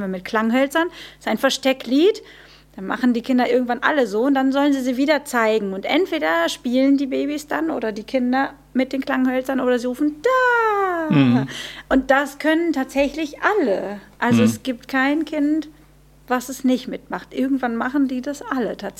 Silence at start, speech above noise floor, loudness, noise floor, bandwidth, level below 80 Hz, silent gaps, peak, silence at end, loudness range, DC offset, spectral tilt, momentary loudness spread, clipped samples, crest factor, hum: 0 s; 30 dB; -20 LUFS; -50 dBFS; 15.5 kHz; -52 dBFS; none; -2 dBFS; 0.1 s; 3 LU; under 0.1%; -5 dB/octave; 8 LU; under 0.1%; 18 dB; none